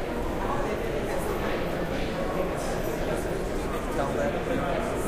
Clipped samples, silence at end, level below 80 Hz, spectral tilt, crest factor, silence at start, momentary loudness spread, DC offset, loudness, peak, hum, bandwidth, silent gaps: under 0.1%; 0 s; -36 dBFS; -5.5 dB/octave; 14 dB; 0 s; 3 LU; under 0.1%; -29 LUFS; -14 dBFS; none; 16 kHz; none